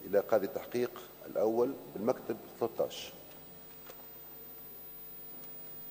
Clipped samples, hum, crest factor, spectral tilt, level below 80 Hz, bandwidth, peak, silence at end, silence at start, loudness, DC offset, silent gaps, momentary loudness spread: under 0.1%; none; 22 dB; -5.5 dB/octave; -72 dBFS; 16 kHz; -16 dBFS; 0 s; 0 s; -36 LUFS; under 0.1%; none; 16 LU